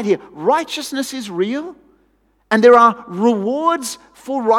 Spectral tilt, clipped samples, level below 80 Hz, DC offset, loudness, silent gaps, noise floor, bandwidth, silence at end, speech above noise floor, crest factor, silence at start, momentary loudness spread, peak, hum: -4.5 dB/octave; under 0.1%; -62 dBFS; under 0.1%; -16 LUFS; none; -60 dBFS; 15 kHz; 0 s; 44 dB; 16 dB; 0 s; 16 LU; 0 dBFS; none